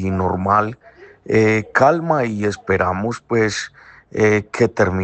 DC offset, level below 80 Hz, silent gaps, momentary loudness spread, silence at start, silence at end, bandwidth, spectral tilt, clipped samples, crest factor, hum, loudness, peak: under 0.1%; -52 dBFS; none; 9 LU; 0 s; 0 s; 8.8 kHz; -6 dB/octave; under 0.1%; 16 dB; none; -18 LUFS; -2 dBFS